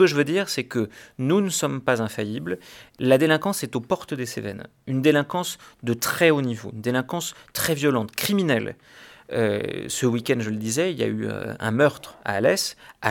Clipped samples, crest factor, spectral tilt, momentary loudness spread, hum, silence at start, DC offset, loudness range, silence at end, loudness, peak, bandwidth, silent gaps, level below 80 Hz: under 0.1%; 20 dB; -4.5 dB/octave; 11 LU; none; 0 s; under 0.1%; 2 LU; 0 s; -24 LUFS; -4 dBFS; 19 kHz; none; -62 dBFS